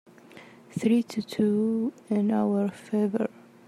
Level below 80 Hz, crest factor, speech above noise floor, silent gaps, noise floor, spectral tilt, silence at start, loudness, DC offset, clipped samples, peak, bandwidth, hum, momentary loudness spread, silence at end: -76 dBFS; 16 dB; 24 dB; none; -50 dBFS; -7.5 dB/octave; 0.35 s; -27 LUFS; under 0.1%; under 0.1%; -12 dBFS; 12.5 kHz; none; 7 LU; 0.4 s